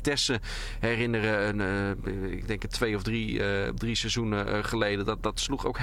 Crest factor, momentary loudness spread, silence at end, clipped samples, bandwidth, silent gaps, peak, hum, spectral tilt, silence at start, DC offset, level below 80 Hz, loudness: 16 dB; 6 LU; 0 s; under 0.1%; 15.5 kHz; none; -12 dBFS; none; -4.5 dB/octave; 0 s; under 0.1%; -40 dBFS; -29 LUFS